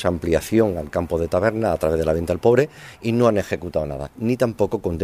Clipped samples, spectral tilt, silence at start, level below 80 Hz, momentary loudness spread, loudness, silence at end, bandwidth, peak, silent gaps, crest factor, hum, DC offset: under 0.1%; -7 dB/octave; 0 s; -40 dBFS; 8 LU; -21 LUFS; 0 s; 15.5 kHz; -2 dBFS; none; 18 dB; none; under 0.1%